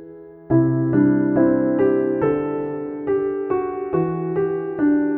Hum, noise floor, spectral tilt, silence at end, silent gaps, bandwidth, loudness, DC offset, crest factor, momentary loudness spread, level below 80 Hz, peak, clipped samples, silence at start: none; -40 dBFS; -13 dB/octave; 0 s; none; 3.3 kHz; -20 LUFS; under 0.1%; 14 dB; 6 LU; -52 dBFS; -6 dBFS; under 0.1%; 0 s